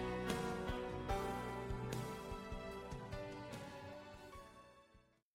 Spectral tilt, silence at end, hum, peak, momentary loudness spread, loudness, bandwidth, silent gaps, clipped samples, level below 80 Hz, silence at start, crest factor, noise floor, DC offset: -5.5 dB/octave; 0.35 s; none; -28 dBFS; 14 LU; -46 LUFS; 16 kHz; none; under 0.1%; -54 dBFS; 0 s; 18 dB; -70 dBFS; under 0.1%